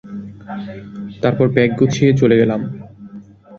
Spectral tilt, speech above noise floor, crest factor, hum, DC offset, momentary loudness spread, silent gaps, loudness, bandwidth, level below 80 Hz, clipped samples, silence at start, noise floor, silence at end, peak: -7.5 dB/octave; 23 dB; 16 dB; none; under 0.1%; 21 LU; none; -15 LUFS; 7.6 kHz; -50 dBFS; under 0.1%; 0.05 s; -38 dBFS; 0 s; 0 dBFS